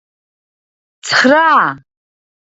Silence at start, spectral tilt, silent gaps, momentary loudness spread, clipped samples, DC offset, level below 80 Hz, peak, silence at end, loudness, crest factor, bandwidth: 1.05 s; -3 dB/octave; none; 11 LU; under 0.1%; under 0.1%; -66 dBFS; 0 dBFS; 0.65 s; -11 LUFS; 16 dB; 8 kHz